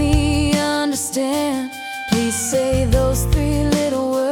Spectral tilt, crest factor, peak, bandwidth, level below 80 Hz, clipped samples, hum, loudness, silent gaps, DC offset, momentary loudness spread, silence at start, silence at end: -5 dB/octave; 14 dB; -4 dBFS; 18 kHz; -26 dBFS; under 0.1%; none; -19 LUFS; none; under 0.1%; 4 LU; 0 s; 0 s